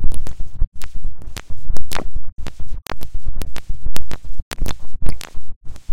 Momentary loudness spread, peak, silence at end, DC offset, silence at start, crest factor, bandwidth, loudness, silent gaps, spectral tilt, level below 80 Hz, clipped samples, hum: 7 LU; 0 dBFS; 0 s; under 0.1%; 0 s; 10 dB; 12 kHz; -32 LUFS; 0.67-0.72 s, 4.42-4.51 s, 5.56-5.61 s; -4.5 dB/octave; -24 dBFS; 0.9%; none